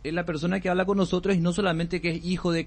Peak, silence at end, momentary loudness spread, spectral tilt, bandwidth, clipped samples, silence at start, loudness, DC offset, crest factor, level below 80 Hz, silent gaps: -10 dBFS; 0 s; 4 LU; -6.5 dB/octave; 8.8 kHz; under 0.1%; 0 s; -26 LUFS; under 0.1%; 16 dB; -46 dBFS; none